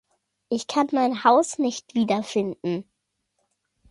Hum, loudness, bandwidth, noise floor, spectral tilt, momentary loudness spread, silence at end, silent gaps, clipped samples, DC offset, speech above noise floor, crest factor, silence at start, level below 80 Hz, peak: none; -23 LUFS; 11.5 kHz; -77 dBFS; -4.5 dB/octave; 11 LU; 1.1 s; none; under 0.1%; under 0.1%; 55 dB; 20 dB; 0.5 s; -68 dBFS; -4 dBFS